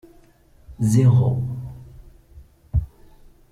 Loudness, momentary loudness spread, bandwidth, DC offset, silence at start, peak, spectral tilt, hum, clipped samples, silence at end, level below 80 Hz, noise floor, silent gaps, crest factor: -20 LUFS; 23 LU; 13 kHz; under 0.1%; 0.7 s; -6 dBFS; -8.5 dB/octave; none; under 0.1%; 0.65 s; -38 dBFS; -53 dBFS; none; 16 dB